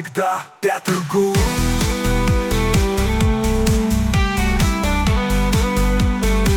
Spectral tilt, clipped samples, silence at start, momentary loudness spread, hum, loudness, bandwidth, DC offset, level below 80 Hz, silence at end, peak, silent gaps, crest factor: -5.5 dB/octave; under 0.1%; 0 s; 3 LU; none; -18 LUFS; 18 kHz; under 0.1%; -22 dBFS; 0 s; -6 dBFS; none; 10 dB